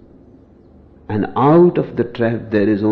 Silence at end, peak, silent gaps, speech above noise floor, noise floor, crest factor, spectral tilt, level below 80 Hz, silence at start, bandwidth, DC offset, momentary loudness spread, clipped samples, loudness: 0 s; -2 dBFS; none; 31 dB; -45 dBFS; 14 dB; -10.5 dB/octave; -50 dBFS; 1.1 s; 4.6 kHz; under 0.1%; 11 LU; under 0.1%; -16 LUFS